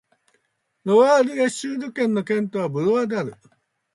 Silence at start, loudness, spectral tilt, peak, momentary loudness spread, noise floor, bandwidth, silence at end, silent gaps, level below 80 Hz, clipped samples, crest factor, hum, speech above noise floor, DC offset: 0.85 s; -21 LUFS; -5.5 dB/octave; -4 dBFS; 12 LU; -71 dBFS; 11.5 kHz; 0.6 s; none; -72 dBFS; under 0.1%; 18 dB; none; 51 dB; under 0.1%